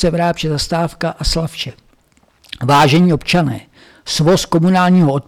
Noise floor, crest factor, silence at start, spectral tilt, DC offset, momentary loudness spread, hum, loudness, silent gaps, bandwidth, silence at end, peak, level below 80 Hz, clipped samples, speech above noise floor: -54 dBFS; 10 dB; 0 s; -5.5 dB/octave; under 0.1%; 14 LU; none; -14 LUFS; none; 14.5 kHz; 0.05 s; -6 dBFS; -32 dBFS; under 0.1%; 41 dB